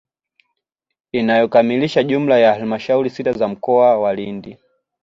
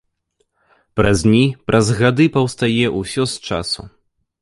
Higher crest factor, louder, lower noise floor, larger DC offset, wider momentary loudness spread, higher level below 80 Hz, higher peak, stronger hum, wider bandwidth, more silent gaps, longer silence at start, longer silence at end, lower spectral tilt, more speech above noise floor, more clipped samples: about the same, 16 dB vs 16 dB; about the same, -16 LUFS vs -17 LUFS; first, -80 dBFS vs -68 dBFS; neither; about the same, 10 LU vs 9 LU; second, -58 dBFS vs -40 dBFS; about the same, -2 dBFS vs -2 dBFS; neither; second, 7.6 kHz vs 11.5 kHz; neither; first, 1.15 s vs 0.95 s; about the same, 0.5 s vs 0.55 s; first, -7 dB/octave vs -5.5 dB/octave; first, 65 dB vs 52 dB; neither